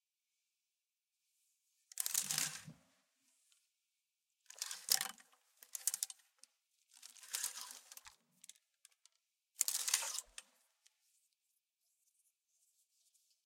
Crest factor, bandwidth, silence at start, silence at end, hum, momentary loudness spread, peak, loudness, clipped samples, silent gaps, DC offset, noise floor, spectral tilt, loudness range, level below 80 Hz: 36 dB; 17 kHz; 1.95 s; 3.05 s; none; 24 LU; -10 dBFS; -39 LUFS; under 0.1%; none; under 0.1%; under -90 dBFS; 1.5 dB/octave; 4 LU; under -90 dBFS